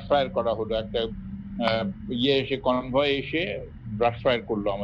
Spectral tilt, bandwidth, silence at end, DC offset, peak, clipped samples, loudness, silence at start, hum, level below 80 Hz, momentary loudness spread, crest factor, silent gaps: -7.5 dB/octave; 7.2 kHz; 0 s; under 0.1%; -8 dBFS; under 0.1%; -26 LUFS; 0 s; none; -46 dBFS; 9 LU; 18 dB; none